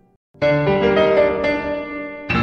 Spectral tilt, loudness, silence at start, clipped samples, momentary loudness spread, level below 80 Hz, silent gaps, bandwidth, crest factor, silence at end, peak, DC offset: -7.5 dB/octave; -18 LUFS; 0.4 s; under 0.1%; 11 LU; -42 dBFS; none; 6.8 kHz; 14 dB; 0 s; -4 dBFS; under 0.1%